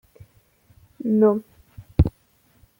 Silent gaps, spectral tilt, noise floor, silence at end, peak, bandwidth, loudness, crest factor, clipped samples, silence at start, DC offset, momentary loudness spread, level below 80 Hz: none; -11 dB/octave; -61 dBFS; 0.7 s; -2 dBFS; 16.5 kHz; -22 LUFS; 22 dB; under 0.1%; 1.05 s; under 0.1%; 11 LU; -34 dBFS